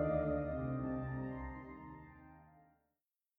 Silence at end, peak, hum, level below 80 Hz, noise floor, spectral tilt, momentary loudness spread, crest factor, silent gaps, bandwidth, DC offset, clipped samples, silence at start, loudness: 0.8 s; -24 dBFS; none; -54 dBFS; under -90 dBFS; -10 dB/octave; 21 LU; 18 dB; none; 4 kHz; under 0.1%; under 0.1%; 0 s; -41 LUFS